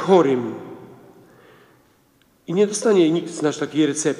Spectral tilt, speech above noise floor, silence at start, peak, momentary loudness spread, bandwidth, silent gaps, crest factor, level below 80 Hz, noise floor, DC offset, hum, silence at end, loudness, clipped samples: -5 dB/octave; 40 dB; 0 s; -2 dBFS; 22 LU; 12 kHz; none; 18 dB; -70 dBFS; -59 dBFS; under 0.1%; none; 0 s; -20 LUFS; under 0.1%